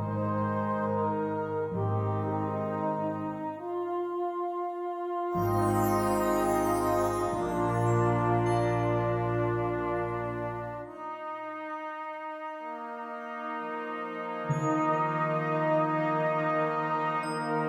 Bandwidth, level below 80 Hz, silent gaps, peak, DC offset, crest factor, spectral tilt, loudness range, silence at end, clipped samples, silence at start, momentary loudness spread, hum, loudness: 18 kHz; -54 dBFS; none; -14 dBFS; under 0.1%; 16 dB; -7 dB/octave; 9 LU; 0 s; under 0.1%; 0 s; 11 LU; none; -30 LUFS